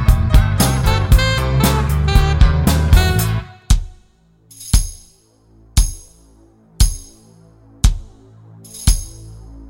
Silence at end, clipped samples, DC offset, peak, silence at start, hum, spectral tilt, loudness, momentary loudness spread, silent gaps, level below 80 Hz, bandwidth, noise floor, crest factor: 0.05 s; under 0.1%; under 0.1%; 0 dBFS; 0 s; none; -5 dB/octave; -16 LUFS; 20 LU; none; -18 dBFS; 17 kHz; -52 dBFS; 16 dB